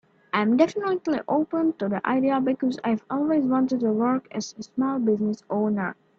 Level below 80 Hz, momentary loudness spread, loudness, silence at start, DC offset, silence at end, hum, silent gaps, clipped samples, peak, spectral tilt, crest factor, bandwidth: -68 dBFS; 6 LU; -24 LUFS; 0.35 s; under 0.1%; 0.25 s; none; none; under 0.1%; -6 dBFS; -6.5 dB/octave; 18 dB; 7.4 kHz